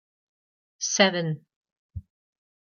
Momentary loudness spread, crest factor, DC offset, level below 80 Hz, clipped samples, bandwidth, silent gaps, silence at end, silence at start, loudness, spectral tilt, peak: 23 LU; 26 dB; under 0.1%; -58 dBFS; under 0.1%; 10 kHz; 1.56-1.61 s, 1.72-1.89 s; 0.65 s; 0.8 s; -24 LUFS; -3 dB/octave; -4 dBFS